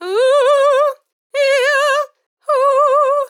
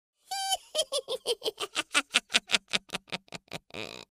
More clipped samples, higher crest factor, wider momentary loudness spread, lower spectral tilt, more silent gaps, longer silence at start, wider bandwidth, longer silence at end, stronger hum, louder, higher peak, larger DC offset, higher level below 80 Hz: neither; second, 10 dB vs 32 dB; second, 9 LU vs 14 LU; second, 2 dB/octave vs -0.5 dB/octave; first, 1.12-1.30 s, 2.26-2.37 s vs none; second, 0 s vs 0.3 s; about the same, 15.5 kHz vs 15.5 kHz; second, 0 s vs 0.15 s; neither; first, -14 LUFS vs -30 LUFS; second, -4 dBFS vs 0 dBFS; neither; second, under -90 dBFS vs -70 dBFS